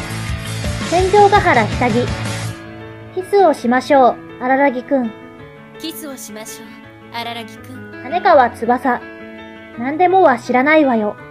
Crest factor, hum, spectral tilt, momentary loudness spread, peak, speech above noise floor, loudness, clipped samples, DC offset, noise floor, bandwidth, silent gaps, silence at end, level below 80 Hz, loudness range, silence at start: 16 dB; none; -5.5 dB/octave; 21 LU; 0 dBFS; 22 dB; -15 LUFS; under 0.1%; under 0.1%; -37 dBFS; 15.5 kHz; none; 0 s; -38 dBFS; 7 LU; 0 s